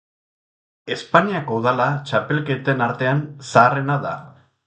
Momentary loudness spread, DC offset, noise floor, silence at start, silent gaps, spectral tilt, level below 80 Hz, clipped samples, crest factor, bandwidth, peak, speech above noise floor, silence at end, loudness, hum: 14 LU; under 0.1%; under -90 dBFS; 0.85 s; none; -6.5 dB/octave; -60 dBFS; under 0.1%; 20 dB; 9.2 kHz; 0 dBFS; over 71 dB; 0.35 s; -19 LUFS; none